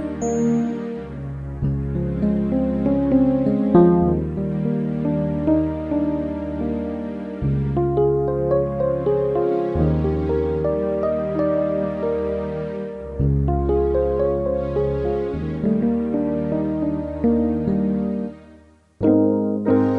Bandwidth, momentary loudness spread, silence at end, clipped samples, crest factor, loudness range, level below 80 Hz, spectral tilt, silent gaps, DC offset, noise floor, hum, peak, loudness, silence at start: 7.4 kHz; 8 LU; 0 s; under 0.1%; 18 dB; 4 LU; -36 dBFS; -9.5 dB/octave; none; under 0.1%; -49 dBFS; none; -2 dBFS; -21 LUFS; 0 s